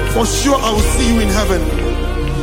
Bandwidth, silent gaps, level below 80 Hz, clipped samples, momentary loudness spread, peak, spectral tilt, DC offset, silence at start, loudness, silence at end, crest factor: 16.5 kHz; none; -18 dBFS; under 0.1%; 6 LU; -2 dBFS; -4.5 dB/octave; under 0.1%; 0 s; -15 LUFS; 0 s; 12 dB